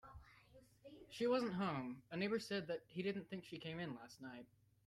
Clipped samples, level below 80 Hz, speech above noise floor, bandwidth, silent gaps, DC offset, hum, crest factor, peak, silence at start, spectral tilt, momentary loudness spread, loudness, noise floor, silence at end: under 0.1%; -74 dBFS; 24 dB; 14 kHz; none; under 0.1%; none; 18 dB; -28 dBFS; 0.05 s; -6 dB/octave; 22 LU; -44 LUFS; -68 dBFS; 0.4 s